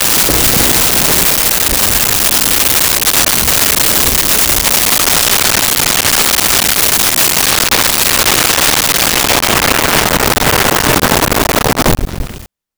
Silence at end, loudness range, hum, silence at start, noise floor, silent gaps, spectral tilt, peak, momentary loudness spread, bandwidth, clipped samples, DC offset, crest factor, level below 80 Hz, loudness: 0.3 s; 2 LU; none; 0 s; -31 dBFS; none; -1.5 dB/octave; 0 dBFS; 3 LU; over 20 kHz; under 0.1%; under 0.1%; 10 dB; -26 dBFS; -8 LUFS